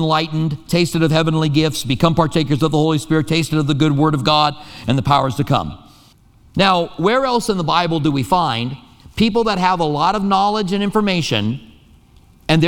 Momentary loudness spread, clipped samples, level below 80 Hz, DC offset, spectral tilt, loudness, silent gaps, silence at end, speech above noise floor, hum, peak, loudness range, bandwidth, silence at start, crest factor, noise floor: 6 LU; under 0.1%; -42 dBFS; under 0.1%; -6 dB/octave; -17 LUFS; none; 0 s; 32 dB; none; 0 dBFS; 2 LU; 17 kHz; 0 s; 16 dB; -49 dBFS